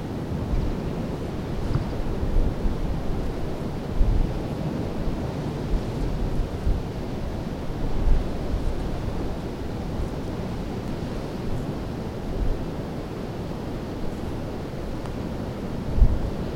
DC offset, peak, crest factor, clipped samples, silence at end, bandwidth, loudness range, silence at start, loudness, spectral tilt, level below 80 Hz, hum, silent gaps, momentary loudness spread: under 0.1%; -4 dBFS; 22 dB; under 0.1%; 0 s; 13.5 kHz; 3 LU; 0 s; -29 LUFS; -7.5 dB/octave; -28 dBFS; none; none; 5 LU